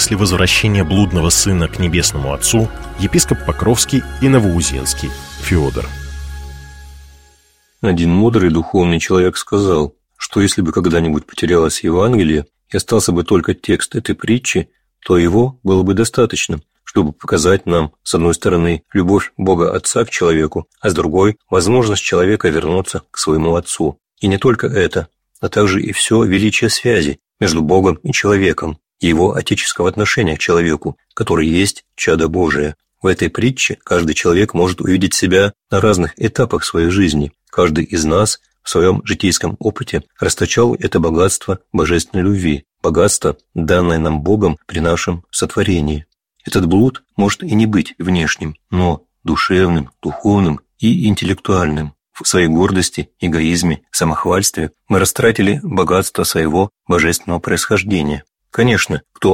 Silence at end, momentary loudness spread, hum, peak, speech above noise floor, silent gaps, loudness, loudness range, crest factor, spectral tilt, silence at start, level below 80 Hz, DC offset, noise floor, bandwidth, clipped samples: 0 s; 7 LU; none; 0 dBFS; 40 dB; none; -15 LUFS; 2 LU; 14 dB; -4.5 dB/octave; 0 s; -32 dBFS; under 0.1%; -55 dBFS; 16.5 kHz; under 0.1%